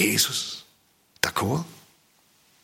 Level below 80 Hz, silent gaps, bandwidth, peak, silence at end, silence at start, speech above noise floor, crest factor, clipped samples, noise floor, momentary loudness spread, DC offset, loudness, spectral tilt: -62 dBFS; none; 16.5 kHz; -2 dBFS; 0.85 s; 0 s; 37 dB; 26 dB; under 0.1%; -62 dBFS; 16 LU; under 0.1%; -25 LUFS; -2.5 dB/octave